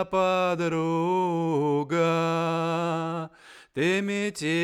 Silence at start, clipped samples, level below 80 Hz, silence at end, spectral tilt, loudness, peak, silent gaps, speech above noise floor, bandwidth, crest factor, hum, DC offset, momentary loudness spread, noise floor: 0 s; under 0.1%; -66 dBFS; 0 s; -6 dB/octave; -26 LUFS; -12 dBFS; none; 25 dB; 12.5 kHz; 14 dB; none; under 0.1%; 6 LU; -50 dBFS